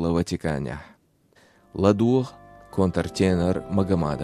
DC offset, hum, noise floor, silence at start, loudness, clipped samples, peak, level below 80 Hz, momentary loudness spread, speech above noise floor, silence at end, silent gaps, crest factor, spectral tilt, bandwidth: under 0.1%; none; -60 dBFS; 0 s; -24 LUFS; under 0.1%; -4 dBFS; -46 dBFS; 13 LU; 37 dB; 0 s; none; 20 dB; -7 dB/octave; 12.5 kHz